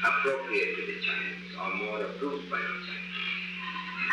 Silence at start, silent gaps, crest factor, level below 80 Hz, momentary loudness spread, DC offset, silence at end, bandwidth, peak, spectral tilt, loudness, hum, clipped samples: 0 s; none; 18 dB; -68 dBFS; 7 LU; under 0.1%; 0 s; 11 kHz; -14 dBFS; -4.5 dB/octave; -31 LUFS; none; under 0.1%